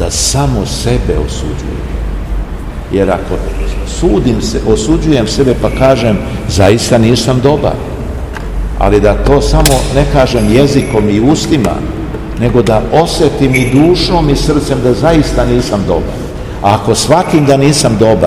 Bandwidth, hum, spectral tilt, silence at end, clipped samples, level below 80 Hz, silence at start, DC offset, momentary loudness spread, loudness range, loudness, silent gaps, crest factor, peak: over 20 kHz; none; -5.5 dB/octave; 0 s; 2%; -18 dBFS; 0 s; 0.8%; 12 LU; 5 LU; -11 LUFS; none; 10 dB; 0 dBFS